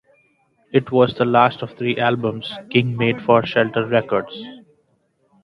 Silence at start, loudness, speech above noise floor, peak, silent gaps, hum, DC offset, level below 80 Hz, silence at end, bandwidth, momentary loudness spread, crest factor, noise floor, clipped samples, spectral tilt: 0.75 s; -19 LUFS; 46 dB; 0 dBFS; none; none; under 0.1%; -58 dBFS; 0.85 s; 6 kHz; 9 LU; 20 dB; -64 dBFS; under 0.1%; -8.5 dB/octave